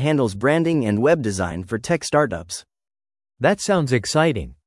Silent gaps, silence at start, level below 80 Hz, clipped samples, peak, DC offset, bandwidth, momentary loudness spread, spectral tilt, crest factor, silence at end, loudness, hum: none; 0 s; -48 dBFS; under 0.1%; -4 dBFS; under 0.1%; 12 kHz; 8 LU; -5.5 dB/octave; 16 dB; 0.15 s; -20 LUFS; none